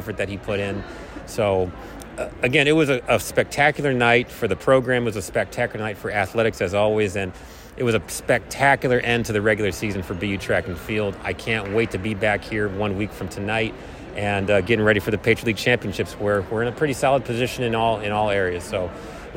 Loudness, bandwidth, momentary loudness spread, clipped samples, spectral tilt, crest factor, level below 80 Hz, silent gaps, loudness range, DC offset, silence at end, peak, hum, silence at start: -22 LUFS; 16.5 kHz; 10 LU; under 0.1%; -5 dB/octave; 18 dB; -44 dBFS; none; 4 LU; under 0.1%; 0 s; -4 dBFS; none; 0 s